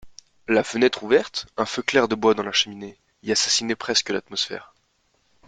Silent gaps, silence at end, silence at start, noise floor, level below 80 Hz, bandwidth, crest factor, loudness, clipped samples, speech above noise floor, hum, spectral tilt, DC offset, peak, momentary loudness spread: none; 0.8 s; 0.05 s; -67 dBFS; -62 dBFS; 9.6 kHz; 20 dB; -22 LUFS; under 0.1%; 44 dB; none; -2.5 dB/octave; under 0.1%; -4 dBFS; 14 LU